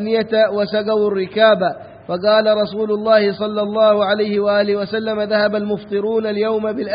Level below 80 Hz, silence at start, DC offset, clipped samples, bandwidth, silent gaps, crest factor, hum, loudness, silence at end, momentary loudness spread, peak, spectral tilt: -60 dBFS; 0 s; under 0.1%; under 0.1%; 5.2 kHz; none; 16 dB; none; -17 LUFS; 0 s; 7 LU; 0 dBFS; -10.5 dB/octave